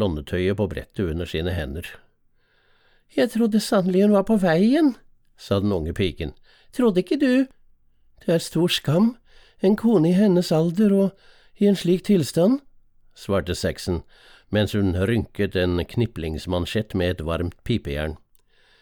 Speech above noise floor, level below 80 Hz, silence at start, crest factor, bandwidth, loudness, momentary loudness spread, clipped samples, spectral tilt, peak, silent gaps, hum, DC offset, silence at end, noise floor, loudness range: 40 dB; -42 dBFS; 0 s; 16 dB; 19.5 kHz; -22 LUFS; 11 LU; under 0.1%; -6.5 dB/octave; -8 dBFS; none; none; under 0.1%; 0.65 s; -62 dBFS; 5 LU